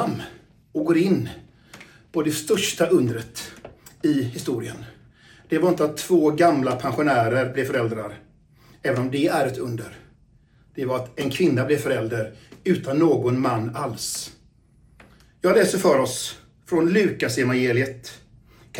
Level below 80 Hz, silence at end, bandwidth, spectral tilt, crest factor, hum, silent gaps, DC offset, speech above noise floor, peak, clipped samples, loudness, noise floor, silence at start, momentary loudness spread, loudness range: -58 dBFS; 0 s; 17 kHz; -5.5 dB/octave; 18 dB; none; none; under 0.1%; 35 dB; -4 dBFS; under 0.1%; -22 LUFS; -56 dBFS; 0 s; 15 LU; 4 LU